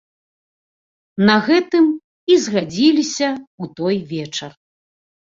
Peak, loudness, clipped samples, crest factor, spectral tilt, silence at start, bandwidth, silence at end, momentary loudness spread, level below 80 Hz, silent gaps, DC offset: -2 dBFS; -17 LUFS; under 0.1%; 18 dB; -4.5 dB/octave; 1.15 s; 7.8 kHz; 0.8 s; 14 LU; -60 dBFS; 2.04-2.27 s, 3.47-3.58 s; under 0.1%